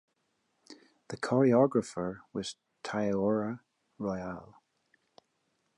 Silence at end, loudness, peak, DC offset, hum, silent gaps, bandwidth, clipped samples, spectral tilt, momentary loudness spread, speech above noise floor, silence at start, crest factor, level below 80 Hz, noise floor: 1.35 s; -31 LUFS; -12 dBFS; under 0.1%; none; none; 11.5 kHz; under 0.1%; -6.5 dB/octave; 18 LU; 48 dB; 0.7 s; 20 dB; -66 dBFS; -78 dBFS